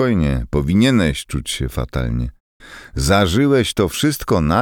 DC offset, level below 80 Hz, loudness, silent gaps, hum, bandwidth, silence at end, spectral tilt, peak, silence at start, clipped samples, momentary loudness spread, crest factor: under 0.1%; -28 dBFS; -18 LUFS; 2.40-2.60 s; none; over 20 kHz; 0 s; -5.5 dB/octave; -2 dBFS; 0 s; under 0.1%; 9 LU; 16 dB